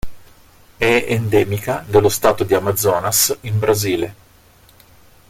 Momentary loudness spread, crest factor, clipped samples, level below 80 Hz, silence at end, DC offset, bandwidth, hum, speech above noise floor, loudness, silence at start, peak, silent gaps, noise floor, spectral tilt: 6 LU; 18 dB; under 0.1%; -42 dBFS; 1.15 s; under 0.1%; 16.5 kHz; none; 33 dB; -17 LUFS; 0.05 s; 0 dBFS; none; -49 dBFS; -4 dB/octave